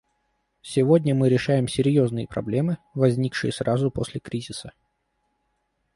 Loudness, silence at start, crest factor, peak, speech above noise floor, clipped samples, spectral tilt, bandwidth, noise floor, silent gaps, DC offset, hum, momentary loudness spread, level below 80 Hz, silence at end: -23 LUFS; 0.65 s; 18 dB; -6 dBFS; 51 dB; under 0.1%; -7 dB/octave; 11.5 kHz; -73 dBFS; none; under 0.1%; none; 12 LU; -54 dBFS; 1.25 s